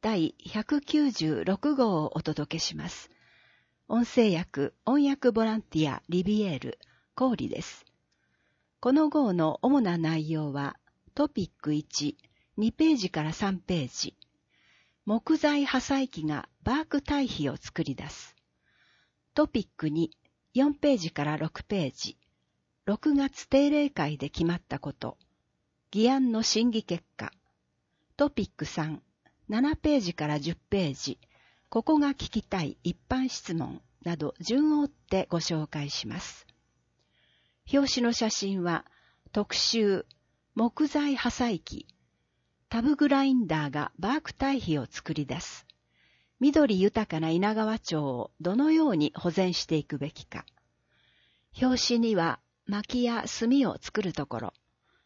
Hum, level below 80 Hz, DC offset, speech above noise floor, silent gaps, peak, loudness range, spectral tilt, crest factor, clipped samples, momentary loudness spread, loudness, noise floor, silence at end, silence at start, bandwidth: none; -56 dBFS; under 0.1%; 49 dB; none; -10 dBFS; 3 LU; -5 dB/octave; 18 dB; under 0.1%; 12 LU; -28 LUFS; -77 dBFS; 0.55 s; 0 s; 7.6 kHz